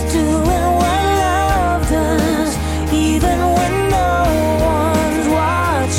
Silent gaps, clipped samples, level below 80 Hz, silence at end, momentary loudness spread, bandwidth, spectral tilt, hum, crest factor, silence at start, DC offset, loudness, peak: none; under 0.1%; -24 dBFS; 0 s; 2 LU; 16.5 kHz; -5.5 dB/octave; none; 10 dB; 0 s; under 0.1%; -15 LUFS; -6 dBFS